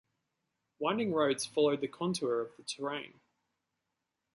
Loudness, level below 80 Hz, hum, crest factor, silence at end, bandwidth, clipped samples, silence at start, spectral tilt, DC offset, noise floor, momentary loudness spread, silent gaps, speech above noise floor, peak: -33 LUFS; -78 dBFS; none; 18 dB; 1.25 s; 11.5 kHz; under 0.1%; 0.8 s; -4.5 dB/octave; under 0.1%; -86 dBFS; 10 LU; none; 53 dB; -16 dBFS